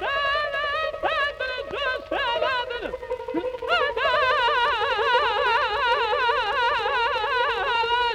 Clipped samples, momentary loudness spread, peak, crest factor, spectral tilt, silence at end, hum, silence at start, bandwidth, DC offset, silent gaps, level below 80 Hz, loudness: under 0.1%; 8 LU; -10 dBFS; 14 dB; -3 dB/octave; 0 s; none; 0 s; 13.5 kHz; under 0.1%; none; -50 dBFS; -23 LUFS